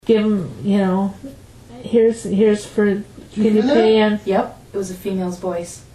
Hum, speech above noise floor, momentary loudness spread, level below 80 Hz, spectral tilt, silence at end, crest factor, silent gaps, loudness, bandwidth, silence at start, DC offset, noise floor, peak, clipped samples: none; 22 dB; 13 LU; -50 dBFS; -6.5 dB/octave; 0.15 s; 16 dB; none; -18 LUFS; 14 kHz; 0.05 s; under 0.1%; -39 dBFS; -2 dBFS; under 0.1%